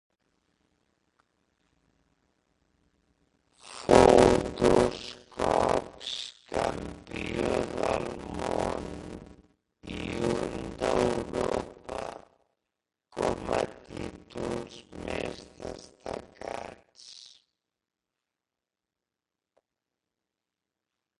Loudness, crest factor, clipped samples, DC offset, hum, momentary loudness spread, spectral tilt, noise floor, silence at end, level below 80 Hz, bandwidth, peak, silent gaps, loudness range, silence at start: -28 LUFS; 30 dB; under 0.1%; under 0.1%; none; 19 LU; -5 dB/octave; -89 dBFS; 3.95 s; -50 dBFS; 11.5 kHz; -2 dBFS; none; 16 LU; 3.65 s